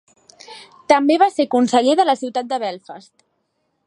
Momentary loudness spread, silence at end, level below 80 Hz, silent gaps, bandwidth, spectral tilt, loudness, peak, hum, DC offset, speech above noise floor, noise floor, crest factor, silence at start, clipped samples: 22 LU; 0.85 s; -72 dBFS; none; 11 kHz; -3.5 dB/octave; -17 LUFS; 0 dBFS; none; under 0.1%; 53 dB; -70 dBFS; 18 dB; 0.5 s; under 0.1%